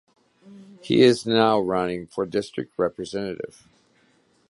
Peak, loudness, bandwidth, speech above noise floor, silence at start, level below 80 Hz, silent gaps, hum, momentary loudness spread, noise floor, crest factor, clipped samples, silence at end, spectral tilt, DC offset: -2 dBFS; -23 LUFS; 11.5 kHz; 40 dB; 0.5 s; -60 dBFS; none; none; 15 LU; -62 dBFS; 22 dB; under 0.1%; 1.05 s; -5.5 dB/octave; under 0.1%